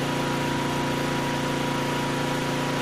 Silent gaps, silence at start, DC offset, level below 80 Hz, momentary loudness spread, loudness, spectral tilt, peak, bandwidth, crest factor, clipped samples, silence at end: none; 0 s; 0.3%; -50 dBFS; 0 LU; -26 LUFS; -5 dB/octave; -12 dBFS; 15.5 kHz; 12 dB; under 0.1%; 0 s